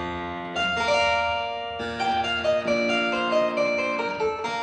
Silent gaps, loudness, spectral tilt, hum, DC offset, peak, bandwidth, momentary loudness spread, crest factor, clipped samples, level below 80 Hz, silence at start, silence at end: none; -24 LUFS; -4 dB/octave; none; under 0.1%; -12 dBFS; 9.8 kHz; 9 LU; 14 dB; under 0.1%; -52 dBFS; 0 s; 0 s